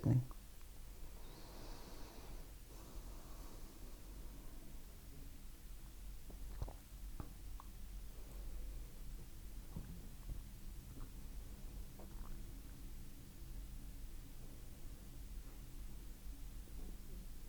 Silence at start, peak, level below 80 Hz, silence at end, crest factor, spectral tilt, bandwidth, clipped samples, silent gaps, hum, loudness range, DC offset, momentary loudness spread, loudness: 0 s; -22 dBFS; -52 dBFS; 0 s; 26 dB; -6 dB/octave; over 20 kHz; under 0.1%; none; none; 2 LU; under 0.1%; 5 LU; -54 LUFS